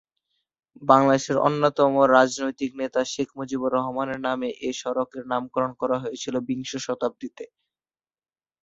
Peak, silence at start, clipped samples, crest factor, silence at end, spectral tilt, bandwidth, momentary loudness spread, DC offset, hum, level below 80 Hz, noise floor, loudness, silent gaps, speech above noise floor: -2 dBFS; 0.8 s; under 0.1%; 22 dB; 1.2 s; -5 dB/octave; 8 kHz; 12 LU; under 0.1%; none; -66 dBFS; under -90 dBFS; -24 LUFS; none; over 67 dB